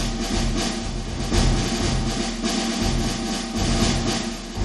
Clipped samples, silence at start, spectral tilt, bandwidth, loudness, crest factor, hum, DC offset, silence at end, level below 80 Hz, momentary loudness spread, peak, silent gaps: under 0.1%; 0 s; -4 dB/octave; 12 kHz; -23 LUFS; 16 dB; none; under 0.1%; 0 s; -28 dBFS; 5 LU; -6 dBFS; none